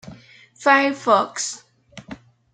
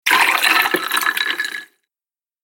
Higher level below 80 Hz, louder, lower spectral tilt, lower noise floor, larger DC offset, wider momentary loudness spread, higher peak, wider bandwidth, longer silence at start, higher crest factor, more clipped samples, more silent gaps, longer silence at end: first, -64 dBFS vs -72 dBFS; second, -19 LUFS vs -16 LUFS; first, -2.5 dB/octave vs 0.5 dB/octave; second, -46 dBFS vs under -90 dBFS; neither; first, 24 LU vs 11 LU; about the same, -2 dBFS vs 0 dBFS; second, 9.6 kHz vs 17 kHz; about the same, 0.05 s vs 0.05 s; about the same, 20 dB vs 18 dB; neither; neither; second, 0.4 s vs 0.8 s